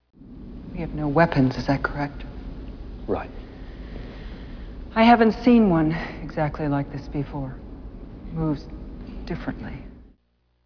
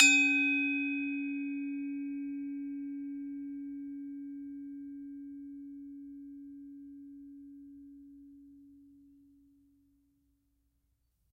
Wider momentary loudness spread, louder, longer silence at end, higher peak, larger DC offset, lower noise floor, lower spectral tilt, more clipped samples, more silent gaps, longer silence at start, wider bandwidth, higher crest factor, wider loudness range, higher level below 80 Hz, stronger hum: about the same, 23 LU vs 23 LU; first, -23 LUFS vs -33 LUFS; second, 0.6 s vs 2.3 s; about the same, -4 dBFS vs -4 dBFS; neither; second, -67 dBFS vs -77 dBFS; first, -8.5 dB/octave vs 0.5 dB/octave; neither; neither; first, 0.2 s vs 0 s; second, 5.4 kHz vs 12.5 kHz; second, 20 dB vs 32 dB; second, 11 LU vs 22 LU; first, -38 dBFS vs -76 dBFS; neither